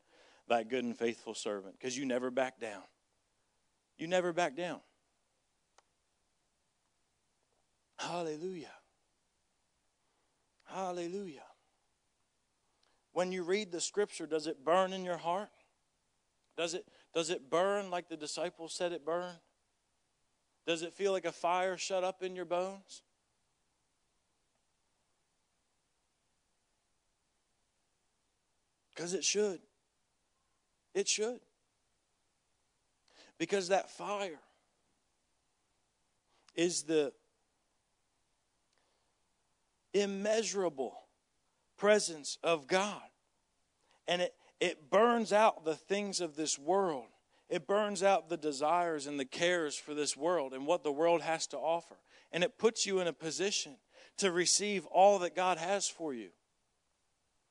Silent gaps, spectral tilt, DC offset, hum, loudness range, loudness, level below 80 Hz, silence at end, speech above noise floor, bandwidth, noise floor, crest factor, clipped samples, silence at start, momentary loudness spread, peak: none; -3 dB/octave; under 0.1%; none; 14 LU; -34 LUFS; -88 dBFS; 1.2 s; 47 dB; 11 kHz; -81 dBFS; 22 dB; under 0.1%; 0.5 s; 13 LU; -14 dBFS